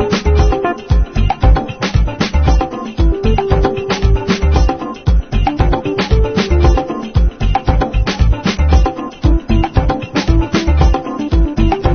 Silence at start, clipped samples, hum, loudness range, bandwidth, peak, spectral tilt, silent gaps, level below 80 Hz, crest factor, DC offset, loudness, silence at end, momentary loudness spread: 0 s; under 0.1%; none; 1 LU; 6.6 kHz; 0 dBFS; -7 dB/octave; none; -14 dBFS; 12 dB; 0.3%; -15 LUFS; 0 s; 4 LU